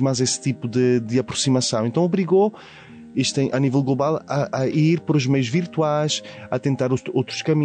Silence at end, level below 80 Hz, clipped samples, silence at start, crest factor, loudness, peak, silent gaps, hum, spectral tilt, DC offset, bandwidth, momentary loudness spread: 0 s; -62 dBFS; under 0.1%; 0 s; 12 dB; -21 LUFS; -8 dBFS; none; none; -5.5 dB/octave; under 0.1%; 9.4 kHz; 5 LU